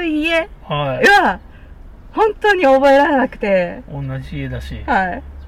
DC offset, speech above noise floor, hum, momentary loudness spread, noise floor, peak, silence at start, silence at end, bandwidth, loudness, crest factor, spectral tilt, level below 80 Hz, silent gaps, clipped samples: under 0.1%; 22 dB; none; 16 LU; -37 dBFS; -4 dBFS; 0 s; 0 s; 15 kHz; -15 LUFS; 12 dB; -5.5 dB/octave; -36 dBFS; none; under 0.1%